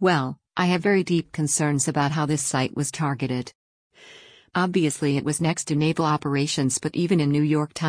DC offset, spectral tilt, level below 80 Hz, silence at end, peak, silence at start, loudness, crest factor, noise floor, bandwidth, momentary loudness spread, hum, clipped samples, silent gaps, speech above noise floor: under 0.1%; -5 dB/octave; -60 dBFS; 0 s; -8 dBFS; 0 s; -23 LUFS; 16 dB; -49 dBFS; 10.5 kHz; 5 LU; none; under 0.1%; 3.55-3.90 s; 26 dB